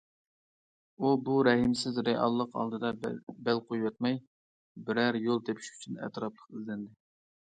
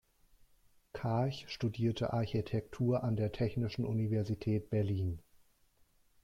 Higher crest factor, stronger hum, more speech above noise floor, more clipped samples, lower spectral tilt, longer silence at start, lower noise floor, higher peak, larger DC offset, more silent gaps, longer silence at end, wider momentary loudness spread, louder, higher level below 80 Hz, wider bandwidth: first, 20 dB vs 14 dB; neither; first, over 59 dB vs 35 dB; neither; second, -5.5 dB/octave vs -8 dB/octave; about the same, 1 s vs 0.95 s; first, under -90 dBFS vs -69 dBFS; first, -12 dBFS vs -22 dBFS; neither; first, 3.23-3.27 s, 4.27-4.75 s vs none; second, 0.6 s vs 1.05 s; first, 14 LU vs 5 LU; first, -31 LUFS vs -36 LUFS; second, -68 dBFS vs -60 dBFS; first, 9.2 kHz vs 7.4 kHz